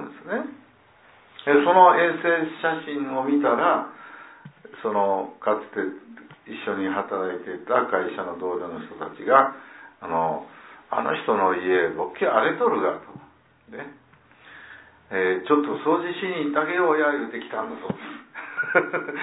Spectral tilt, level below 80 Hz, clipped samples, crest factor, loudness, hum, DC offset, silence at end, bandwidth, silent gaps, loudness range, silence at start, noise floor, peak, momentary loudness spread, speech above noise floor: -9 dB/octave; -70 dBFS; under 0.1%; 22 dB; -23 LUFS; none; under 0.1%; 0 s; 4 kHz; none; 7 LU; 0 s; -55 dBFS; -2 dBFS; 18 LU; 32 dB